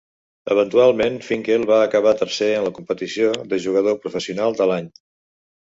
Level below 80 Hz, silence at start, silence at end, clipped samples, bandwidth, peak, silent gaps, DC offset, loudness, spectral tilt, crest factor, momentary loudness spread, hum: -60 dBFS; 0.45 s; 0.8 s; under 0.1%; 7.8 kHz; -4 dBFS; none; under 0.1%; -19 LUFS; -5 dB/octave; 16 dB; 10 LU; none